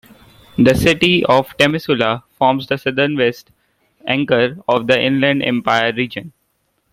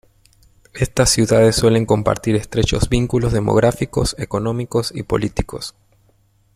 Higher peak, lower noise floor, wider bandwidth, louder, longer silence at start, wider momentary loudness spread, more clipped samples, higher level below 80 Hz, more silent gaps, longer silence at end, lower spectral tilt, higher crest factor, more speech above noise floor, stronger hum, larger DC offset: about the same, 0 dBFS vs -2 dBFS; first, -66 dBFS vs -57 dBFS; about the same, 16 kHz vs 15.5 kHz; about the same, -15 LUFS vs -17 LUFS; second, 0.6 s vs 0.75 s; about the same, 9 LU vs 11 LU; neither; second, -44 dBFS vs -32 dBFS; neither; second, 0.65 s vs 0.85 s; about the same, -5.5 dB/octave vs -5 dB/octave; about the same, 16 dB vs 16 dB; first, 50 dB vs 40 dB; neither; neither